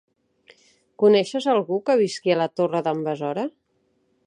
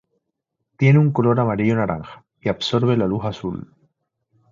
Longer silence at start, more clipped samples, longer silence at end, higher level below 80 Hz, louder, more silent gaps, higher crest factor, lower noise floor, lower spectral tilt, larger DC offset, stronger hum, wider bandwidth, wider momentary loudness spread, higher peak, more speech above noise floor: first, 1 s vs 0.8 s; neither; about the same, 0.75 s vs 0.85 s; second, -76 dBFS vs -50 dBFS; about the same, -22 LUFS vs -20 LUFS; neither; about the same, 18 dB vs 16 dB; second, -68 dBFS vs -78 dBFS; second, -5.5 dB/octave vs -8 dB/octave; neither; neither; first, 10.5 kHz vs 7.4 kHz; second, 9 LU vs 15 LU; about the same, -6 dBFS vs -4 dBFS; second, 47 dB vs 59 dB